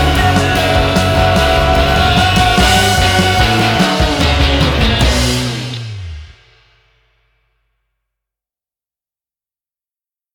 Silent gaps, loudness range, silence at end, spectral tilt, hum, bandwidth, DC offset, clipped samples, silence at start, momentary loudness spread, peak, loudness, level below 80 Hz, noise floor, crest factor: none; 11 LU; 4.1 s; -4.5 dB/octave; none; 19.5 kHz; under 0.1%; under 0.1%; 0 s; 9 LU; 0 dBFS; -11 LUFS; -22 dBFS; under -90 dBFS; 14 dB